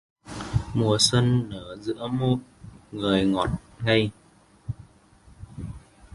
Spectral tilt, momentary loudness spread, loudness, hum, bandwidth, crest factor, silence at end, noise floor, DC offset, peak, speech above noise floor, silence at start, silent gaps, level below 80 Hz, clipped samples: -5 dB/octave; 20 LU; -24 LUFS; none; 11.5 kHz; 20 dB; 0.1 s; -54 dBFS; under 0.1%; -6 dBFS; 30 dB; 0.25 s; none; -46 dBFS; under 0.1%